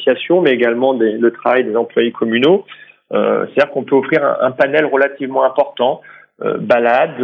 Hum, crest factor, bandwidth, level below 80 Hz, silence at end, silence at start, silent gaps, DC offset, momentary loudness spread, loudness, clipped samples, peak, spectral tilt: none; 14 dB; 6 kHz; -66 dBFS; 0 s; 0 s; none; under 0.1%; 5 LU; -15 LUFS; under 0.1%; 0 dBFS; -7.5 dB/octave